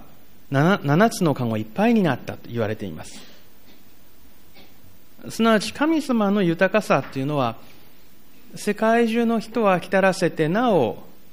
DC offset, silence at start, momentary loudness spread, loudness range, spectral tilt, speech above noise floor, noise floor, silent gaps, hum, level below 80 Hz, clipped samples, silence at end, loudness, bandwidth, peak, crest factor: 1%; 0.5 s; 12 LU; 6 LU; -6 dB/octave; 32 dB; -53 dBFS; none; none; -58 dBFS; under 0.1%; 0.3 s; -21 LUFS; 15.5 kHz; -6 dBFS; 18 dB